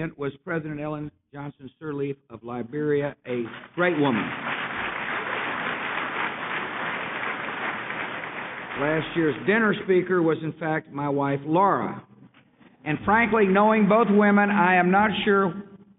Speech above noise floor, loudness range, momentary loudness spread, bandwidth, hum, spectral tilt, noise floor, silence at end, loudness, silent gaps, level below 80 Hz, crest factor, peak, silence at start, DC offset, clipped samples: 32 dB; 9 LU; 15 LU; 4 kHz; none; -4.5 dB/octave; -56 dBFS; 0.2 s; -24 LUFS; none; -60 dBFS; 16 dB; -8 dBFS; 0 s; under 0.1%; under 0.1%